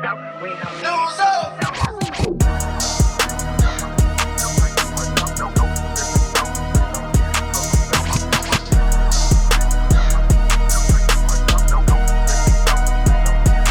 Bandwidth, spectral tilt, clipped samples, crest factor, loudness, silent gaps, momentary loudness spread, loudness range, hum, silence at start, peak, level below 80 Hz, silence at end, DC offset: 18 kHz; -4 dB/octave; under 0.1%; 12 dB; -18 LUFS; none; 5 LU; 2 LU; none; 0 s; -4 dBFS; -18 dBFS; 0 s; under 0.1%